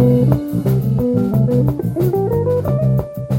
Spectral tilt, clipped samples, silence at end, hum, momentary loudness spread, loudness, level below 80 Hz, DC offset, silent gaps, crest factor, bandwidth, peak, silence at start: -10 dB/octave; under 0.1%; 0 s; none; 3 LU; -16 LUFS; -36 dBFS; under 0.1%; none; 14 dB; 16.5 kHz; -2 dBFS; 0 s